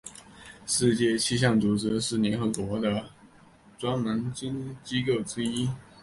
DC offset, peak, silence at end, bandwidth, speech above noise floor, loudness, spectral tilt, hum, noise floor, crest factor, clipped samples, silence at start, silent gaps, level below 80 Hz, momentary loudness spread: under 0.1%; -10 dBFS; 0.2 s; 11.5 kHz; 28 dB; -27 LUFS; -4.5 dB/octave; none; -55 dBFS; 18 dB; under 0.1%; 0.05 s; none; -56 dBFS; 12 LU